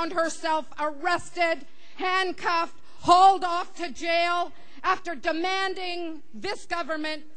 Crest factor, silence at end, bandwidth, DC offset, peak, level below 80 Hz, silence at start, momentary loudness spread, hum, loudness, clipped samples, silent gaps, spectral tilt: 20 dB; 0.15 s; 10 kHz; 2%; -6 dBFS; -62 dBFS; 0 s; 14 LU; none; -26 LUFS; under 0.1%; none; -2.5 dB/octave